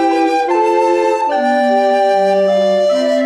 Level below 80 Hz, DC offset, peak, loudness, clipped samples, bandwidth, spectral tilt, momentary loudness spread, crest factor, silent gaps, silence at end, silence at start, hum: -58 dBFS; under 0.1%; -2 dBFS; -13 LUFS; under 0.1%; 11.5 kHz; -5 dB/octave; 2 LU; 10 dB; none; 0 s; 0 s; none